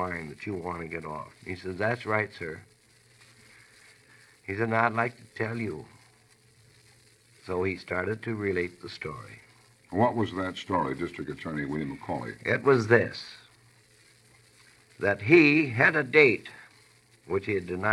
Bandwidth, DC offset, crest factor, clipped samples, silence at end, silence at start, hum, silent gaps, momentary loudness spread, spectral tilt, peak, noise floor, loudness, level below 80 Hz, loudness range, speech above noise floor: 12 kHz; under 0.1%; 24 dB; under 0.1%; 0 s; 0 s; none; none; 18 LU; -6.5 dB/octave; -4 dBFS; -61 dBFS; -27 LUFS; -64 dBFS; 11 LU; 33 dB